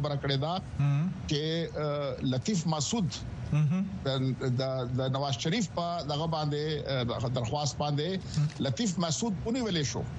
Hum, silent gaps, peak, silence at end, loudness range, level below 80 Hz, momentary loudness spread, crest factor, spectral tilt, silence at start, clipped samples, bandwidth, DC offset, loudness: none; none; -16 dBFS; 0 s; 1 LU; -52 dBFS; 3 LU; 14 dB; -5.5 dB/octave; 0 s; under 0.1%; 8.6 kHz; under 0.1%; -31 LUFS